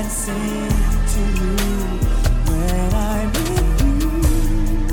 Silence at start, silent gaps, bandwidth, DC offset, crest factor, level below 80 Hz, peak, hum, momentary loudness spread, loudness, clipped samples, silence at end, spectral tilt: 0 s; none; 18.5 kHz; under 0.1%; 12 dB; -18 dBFS; -4 dBFS; none; 3 LU; -20 LUFS; under 0.1%; 0 s; -5.5 dB/octave